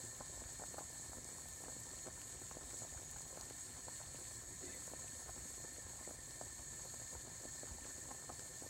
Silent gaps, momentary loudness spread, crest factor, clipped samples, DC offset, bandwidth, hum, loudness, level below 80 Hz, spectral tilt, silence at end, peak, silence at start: none; 1 LU; 18 dB; under 0.1%; under 0.1%; 16 kHz; none; -49 LUFS; -64 dBFS; -2 dB/octave; 0 s; -32 dBFS; 0 s